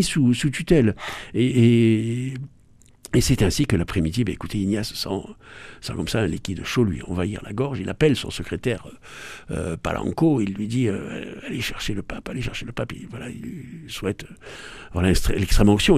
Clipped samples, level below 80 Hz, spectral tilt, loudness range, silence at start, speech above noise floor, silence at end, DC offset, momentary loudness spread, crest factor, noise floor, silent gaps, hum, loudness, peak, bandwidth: under 0.1%; -34 dBFS; -5.5 dB/octave; 8 LU; 0 s; 30 dB; 0 s; under 0.1%; 16 LU; 20 dB; -52 dBFS; none; none; -23 LUFS; -2 dBFS; 14.5 kHz